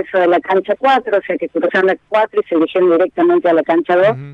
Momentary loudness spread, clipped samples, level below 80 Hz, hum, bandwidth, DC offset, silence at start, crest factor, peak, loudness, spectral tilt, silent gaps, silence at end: 4 LU; under 0.1%; -62 dBFS; none; 6.6 kHz; under 0.1%; 0 s; 12 dB; -2 dBFS; -14 LUFS; -7 dB/octave; none; 0 s